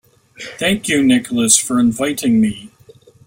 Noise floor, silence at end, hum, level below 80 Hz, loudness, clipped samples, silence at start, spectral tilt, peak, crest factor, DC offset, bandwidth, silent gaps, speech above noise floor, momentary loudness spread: -46 dBFS; 0.6 s; none; -52 dBFS; -15 LUFS; under 0.1%; 0.4 s; -3 dB/octave; 0 dBFS; 16 dB; under 0.1%; 16.5 kHz; none; 31 dB; 15 LU